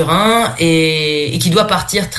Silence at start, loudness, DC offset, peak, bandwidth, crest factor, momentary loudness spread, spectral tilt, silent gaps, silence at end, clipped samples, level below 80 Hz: 0 s; -13 LUFS; under 0.1%; 0 dBFS; 12.5 kHz; 14 dB; 3 LU; -4 dB/octave; none; 0 s; under 0.1%; -40 dBFS